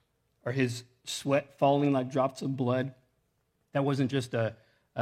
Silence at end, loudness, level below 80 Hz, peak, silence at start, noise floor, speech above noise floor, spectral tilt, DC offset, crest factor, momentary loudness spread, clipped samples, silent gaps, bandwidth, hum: 0 s; -30 LUFS; -74 dBFS; -12 dBFS; 0.45 s; -75 dBFS; 46 dB; -6 dB/octave; under 0.1%; 18 dB; 11 LU; under 0.1%; none; 14.5 kHz; none